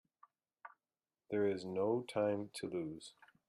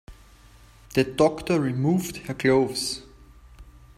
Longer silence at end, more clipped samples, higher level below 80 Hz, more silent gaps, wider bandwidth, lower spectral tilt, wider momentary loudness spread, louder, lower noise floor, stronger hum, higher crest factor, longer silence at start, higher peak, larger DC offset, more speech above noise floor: about the same, 0.4 s vs 0.3 s; neither; second, -80 dBFS vs -50 dBFS; neither; second, 12 kHz vs 16 kHz; about the same, -6 dB/octave vs -5.5 dB/octave; first, 22 LU vs 8 LU; second, -39 LUFS vs -24 LUFS; first, under -90 dBFS vs -51 dBFS; neither; about the same, 18 dB vs 18 dB; first, 0.65 s vs 0.1 s; second, -22 dBFS vs -8 dBFS; neither; first, over 52 dB vs 28 dB